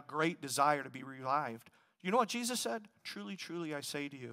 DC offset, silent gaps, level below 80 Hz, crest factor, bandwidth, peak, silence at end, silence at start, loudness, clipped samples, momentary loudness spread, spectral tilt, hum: under 0.1%; none; -88 dBFS; 20 dB; 16 kHz; -16 dBFS; 0 s; 0 s; -36 LUFS; under 0.1%; 12 LU; -3.5 dB/octave; none